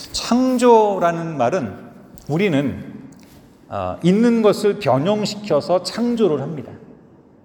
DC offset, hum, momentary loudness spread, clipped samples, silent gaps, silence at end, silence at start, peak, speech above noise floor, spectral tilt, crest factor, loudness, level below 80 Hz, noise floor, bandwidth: under 0.1%; none; 18 LU; under 0.1%; none; 0.7 s; 0 s; -2 dBFS; 30 dB; -6 dB/octave; 18 dB; -18 LUFS; -54 dBFS; -48 dBFS; over 20 kHz